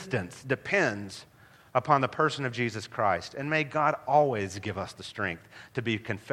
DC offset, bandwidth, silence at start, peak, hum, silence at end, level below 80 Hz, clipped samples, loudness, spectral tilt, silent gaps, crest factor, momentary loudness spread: under 0.1%; 15 kHz; 0 s; -6 dBFS; none; 0 s; -66 dBFS; under 0.1%; -29 LUFS; -5.5 dB/octave; none; 22 dB; 13 LU